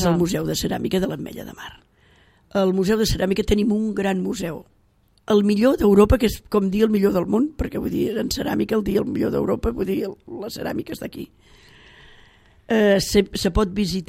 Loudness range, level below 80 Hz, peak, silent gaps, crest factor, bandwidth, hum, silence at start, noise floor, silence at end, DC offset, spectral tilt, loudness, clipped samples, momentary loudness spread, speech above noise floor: 7 LU; -36 dBFS; -2 dBFS; none; 20 dB; 16 kHz; none; 0 s; -60 dBFS; 0.05 s; under 0.1%; -6 dB/octave; -21 LUFS; under 0.1%; 15 LU; 39 dB